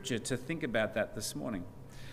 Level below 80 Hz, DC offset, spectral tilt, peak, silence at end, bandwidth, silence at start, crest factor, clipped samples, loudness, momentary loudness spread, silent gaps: -56 dBFS; under 0.1%; -4 dB/octave; -18 dBFS; 0 s; 15.5 kHz; 0 s; 18 dB; under 0.1%; -36 LUFS; 12 LU; none